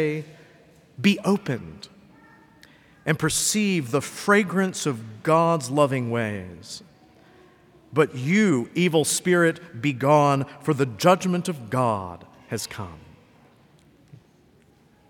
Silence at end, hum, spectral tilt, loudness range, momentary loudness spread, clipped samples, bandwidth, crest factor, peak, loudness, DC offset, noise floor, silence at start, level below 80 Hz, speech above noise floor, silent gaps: 2.1 s; none; -5 dB/octave; 7 LU; 16 LU; under 0.1%; 19 kHz; 20 dB; -4 dBFS; -23 LUFS; under 0.1%; -57 dBFS; 0 s; -62 dBFS; 35 dB; none